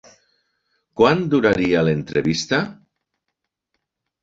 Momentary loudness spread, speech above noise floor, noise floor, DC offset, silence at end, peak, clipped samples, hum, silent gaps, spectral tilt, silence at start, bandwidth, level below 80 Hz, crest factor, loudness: 6 LU; 61 dB; -79 dBFS; under 0.1%; 1.5 s; -2 dBFS; under 0.1%; none; none; -5.5 dB/octave; 0.95 s; 7.8 kHz; -52 dBFS; 20 dB; -19 LUFS